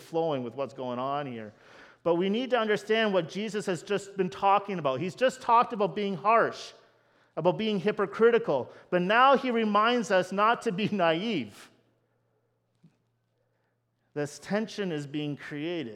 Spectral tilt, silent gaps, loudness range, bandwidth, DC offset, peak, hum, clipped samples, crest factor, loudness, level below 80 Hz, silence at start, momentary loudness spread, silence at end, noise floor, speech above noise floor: -5.5 dB/octave; none; 12 LU; 13 kHz; under 0.1%; -8 dBFS; none; under 0.1%; 20 dB; -27 LUFS; -76 dBFS; 0 s; 12 LU; 0 s; -75 dBFS; 47 dB